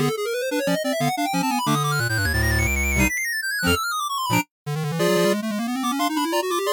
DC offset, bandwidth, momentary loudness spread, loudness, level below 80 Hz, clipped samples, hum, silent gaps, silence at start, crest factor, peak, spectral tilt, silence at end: under 0.1%; 18 kHz; 4 LU; -22 LUFS; -36 dBFS; under 0.1%; none; 4.51-4.65 s; 0 s; 14 dB; -8 dBFS; -4.5 dB/octave; 0 s